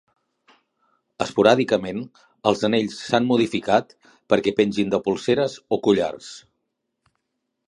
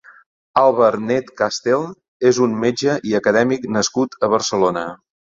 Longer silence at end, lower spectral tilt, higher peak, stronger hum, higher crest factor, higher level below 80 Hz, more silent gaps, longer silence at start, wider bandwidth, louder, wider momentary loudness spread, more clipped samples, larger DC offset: first, 1.3 s vs 0.35 s; about the same, -5.5 dB/octave vs -4.5 dB/octave; about the same, 0 dBFS vs -2 dBFS; neither; first, 22 dB vs 16 dB; about the same, -60 dBFS vs -58 dBFS; second, none vs 2.08-2.20 s; first, 1.2 s vs 0.55 s; first, 11 kHz vs 7.8 kHz; second, -21 LUFS vs -18 LUFS; first, 13 LU vs 6 LU; neither; neither